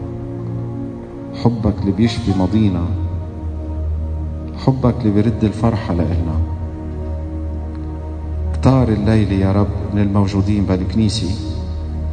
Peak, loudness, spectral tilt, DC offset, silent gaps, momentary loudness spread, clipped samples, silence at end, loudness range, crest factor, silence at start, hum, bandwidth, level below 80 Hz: 0 dBFS; -19 LUFS; -8 dB/octave; under 0.1%; none; 11 LU; under 0.1%; 0 s; 4 LU; 18 dB; 0 s; none; 9.4 kHz; -28 dBFS